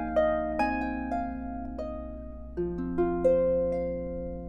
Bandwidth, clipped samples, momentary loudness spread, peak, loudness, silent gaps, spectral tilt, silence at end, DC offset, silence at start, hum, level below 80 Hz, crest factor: 9 kHz; under 0.1%; 13 LU; -14 dBFS; -30 LUFS; none; -8.5 dB/octave; 0 s; under 0.1%; 0 s; none; -42 dBFS; 16 dB